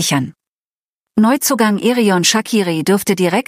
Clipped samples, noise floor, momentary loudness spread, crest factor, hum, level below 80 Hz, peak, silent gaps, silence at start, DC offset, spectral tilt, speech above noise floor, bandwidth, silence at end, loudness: under 0.1%; under -90 dBFS; 6 LU; 14 dB; none; -60 dBFS; -2 dBFS; 0.48-1.07 s; 0 s; under 0.1%; -4 dB/octave; over 76 dB; 15.5 kHz; 0.05 s; -14 LUFS